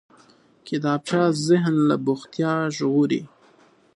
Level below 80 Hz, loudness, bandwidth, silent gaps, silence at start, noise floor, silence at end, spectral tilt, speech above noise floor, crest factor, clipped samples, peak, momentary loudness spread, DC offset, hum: -70 dBFS; -22 LUFS; 11.5 kHz; none; 0.65 s; -56 dBFS; 0.7 s; -6.5 dB/octave; 35 dB; 16 dB; under 0.1%; -6 dBFS; 7 LU; under 0.1%; none